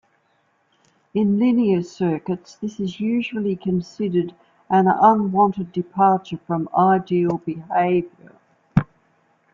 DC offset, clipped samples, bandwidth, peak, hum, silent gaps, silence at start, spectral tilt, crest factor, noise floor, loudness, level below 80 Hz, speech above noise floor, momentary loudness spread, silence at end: under 0.1%; under 0.1%; 7.4 kHz; -2 dBFS; none; none; 1.15 s; -8.5 dB/octave; 18 dB; -65 dBFS; -20 LUFS; -54 dBFS; 45 dB; 10 LU; 0.7 s